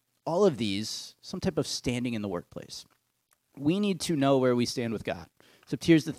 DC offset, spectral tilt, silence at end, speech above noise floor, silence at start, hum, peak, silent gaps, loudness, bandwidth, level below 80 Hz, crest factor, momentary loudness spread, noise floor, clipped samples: under 0.1%; -5.5 dB/octave; 0.05 s; 45 dB; 0.25 s; none; -8 dBFS; none; -29 LUFS; 15.5 kHz; -60 dBFS; 20 dB; 16 LU; -73 dBFS; under 0.1%